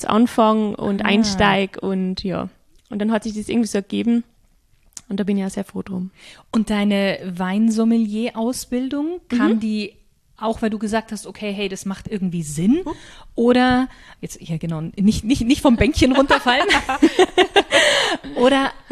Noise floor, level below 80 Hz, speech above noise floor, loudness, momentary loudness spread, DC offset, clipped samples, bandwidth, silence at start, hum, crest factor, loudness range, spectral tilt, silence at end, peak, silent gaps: -57 dBFS; -40 dBFS; 38 dB; -19 LUFS; 13 LU; under 0.1%; under 0.1%; 13.5 kHz; 0 s; none; 18 dB; 8 LU; -5 dB/octave; 0.15 s; -2 dBFS; none